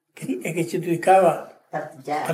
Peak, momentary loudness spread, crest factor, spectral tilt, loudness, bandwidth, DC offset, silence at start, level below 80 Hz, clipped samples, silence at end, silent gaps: -6 dBFS; 16 LU; 18 dB; -6 dB/octave; -22 LUFS; 16 kHz; under 0.1%; 0.15 s; -82 dBFS; under 0.1%; 0 s; none